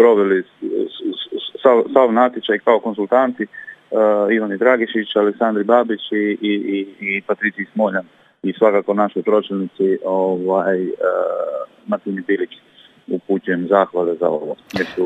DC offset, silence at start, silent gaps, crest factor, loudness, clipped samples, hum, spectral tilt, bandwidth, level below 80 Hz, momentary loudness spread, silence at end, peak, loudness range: under 0.1%; 0 s; none; 18 dB; -18 LUFS; under 0.1%; none; -7 dB/octave; 7.8 kHz; -70 dBFS; 11 LU; 0 s; 0 dBFS; 4 LU